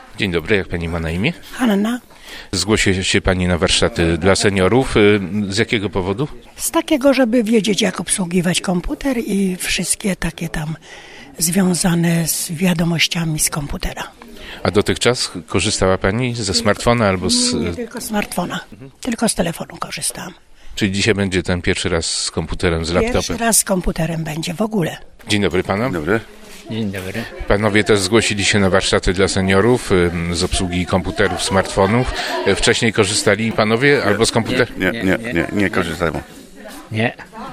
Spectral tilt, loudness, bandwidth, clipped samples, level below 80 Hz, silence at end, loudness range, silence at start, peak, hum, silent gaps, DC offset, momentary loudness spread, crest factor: -4 dB/octave; -17 LUFS; 16 kHz; under 0.1%; -34 dBFS; 0 s; 5 LU; 0 s; 0 dBFS; none; none; under 0.1%; 11 LU; 18 dB